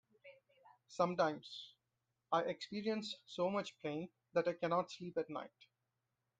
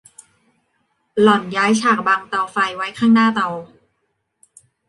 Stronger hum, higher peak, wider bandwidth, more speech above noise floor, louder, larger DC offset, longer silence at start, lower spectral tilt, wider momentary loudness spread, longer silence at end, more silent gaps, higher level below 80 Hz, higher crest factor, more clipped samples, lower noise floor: neither; second, -22 dBFS vs -2 dBFS; second, 9.2 kHz vs 11.5 kHz; second, 48 dB vs 54 dB; second, -40 LUFS vs -17 LUFS; neither; second, 0.25 s vs 1.15 s; about the same, -5.5 dB/octave vs -4.5 dB/octave; first, 13 LU vs 9 LU; second, 0.95 s vs 1.25 s; neither; second, -84 dBFS vs -62 dBFS; about the same, 20 dB vs 18 dB; neither; first, -88 dBFS vs -71 dBFS